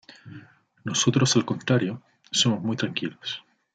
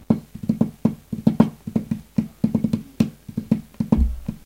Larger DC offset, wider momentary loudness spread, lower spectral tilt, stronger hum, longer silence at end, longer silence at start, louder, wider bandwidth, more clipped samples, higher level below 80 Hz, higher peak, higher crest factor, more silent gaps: neither; first, 17 LU vs 6 LU; second, -4 dB/octave vs -9 dB/octave; neither; first, 0.35 s vs 0.1 s; first, 0.25 s vs 0.1 s; about the same, -24 LUFS vs -23 LUFS; second, 9.4 kHz vs 16 kHz; neither; second, -68 dBFS vs -32 dBFS; second, -8 dBFS vs 0 dBFS; about the same, 18 dB vs 22 dB; neither